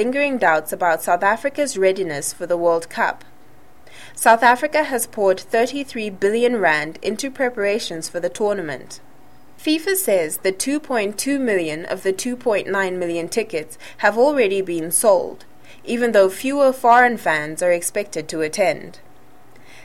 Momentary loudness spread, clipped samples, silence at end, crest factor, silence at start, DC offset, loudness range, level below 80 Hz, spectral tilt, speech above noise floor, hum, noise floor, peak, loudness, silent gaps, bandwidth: 10 LU; under 0.1%; 0.9 s; 20 dB; 0 s; 1%; 5 LU; -60 dBFS; -3 dB/octave; 31 dB; none; -51 dBFS; 0 dBFS; -19 LUFS; none; 16.5 kHz